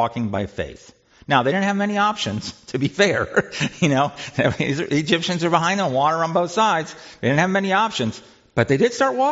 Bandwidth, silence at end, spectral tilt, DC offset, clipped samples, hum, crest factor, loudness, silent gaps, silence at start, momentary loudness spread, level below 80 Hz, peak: 8 kHz; 0 s; -4 dB/octave; under 0.1%; under 0.1%; none; 18 dB; -20 LUFS; none; 0 s; 8 LU; -54 dBFS; -2 dBFS